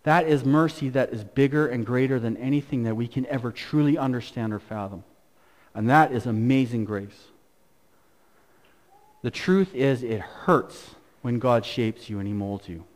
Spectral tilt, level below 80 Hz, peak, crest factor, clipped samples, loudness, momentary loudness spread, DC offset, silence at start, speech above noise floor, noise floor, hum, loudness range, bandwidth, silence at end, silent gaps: -7.5 dB/octave; -58 dBFS; -6 dBFS; 20 dB; under 0.1%; -25 LUFS; 13 LU; under 0.1%; 0.05 s; 40 dB; -64 dBFS; none; 4 LU; 15.5 kHz; 0.15 s; none